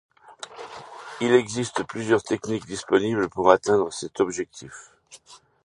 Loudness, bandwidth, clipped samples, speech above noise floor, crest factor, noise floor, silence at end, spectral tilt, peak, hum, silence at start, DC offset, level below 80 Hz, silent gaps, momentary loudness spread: -23 LUFS; 11 kHz; under 0.1%; 20 dB; 24 dB; -43 dBFS; 0.3 s; -4.5 dB/octave; 0 dBFS; none; 0.3 s; under 0.1%; -60 dBFS; none; 21 LU